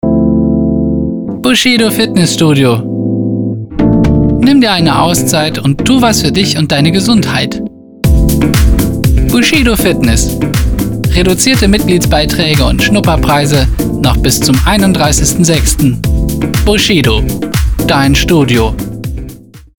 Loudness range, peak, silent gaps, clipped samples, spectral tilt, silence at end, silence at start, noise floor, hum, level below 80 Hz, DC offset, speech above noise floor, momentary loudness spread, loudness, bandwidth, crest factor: 1 LU; 0 dBFS; none; under 0.1%; -4.5 dB/octave; 0.15 s; 0.05 s; -30 dBFS; none; -18 dBFS; under 0.1%; 21 dB; 6 LU; -9 LUFS; over 20 kHz; 10 dB